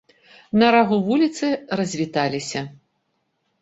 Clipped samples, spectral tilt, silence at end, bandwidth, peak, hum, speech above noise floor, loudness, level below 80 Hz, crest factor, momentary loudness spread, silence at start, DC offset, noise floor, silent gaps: under 0.1%; -5 dB/octave; 0.9 s; 8 kHz; -2 dBFS; none; 52 dB; -20 LUFS; -62 dBFS; 20 dB; 12 LU; 0.55 s; under 0.1%; -72 dBFS; none